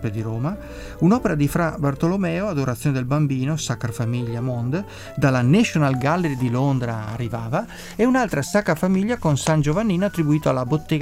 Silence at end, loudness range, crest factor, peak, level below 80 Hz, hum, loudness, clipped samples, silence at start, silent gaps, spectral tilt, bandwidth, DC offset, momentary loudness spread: 0 s; 2 LU; 16 dB; -4 dBFS; -42 dBFS; none; -21 LUFS; under 0.1%; 0 s; none; -6.5 dB/octave; 16 kHz; under 0.1%; 8 LU